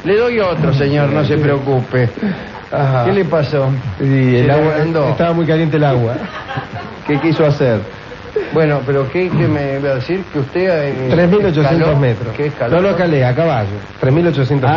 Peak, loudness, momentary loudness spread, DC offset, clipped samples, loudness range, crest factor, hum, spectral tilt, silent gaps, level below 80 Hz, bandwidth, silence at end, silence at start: -2 dBFS; -14 LUFS; 9 LU; under 0.1%; under 0.1%; 3 LU; 12 dB; none; -9 dB/octave; none; -40 dBFS; 6.6 kHz; 0 s; 0 s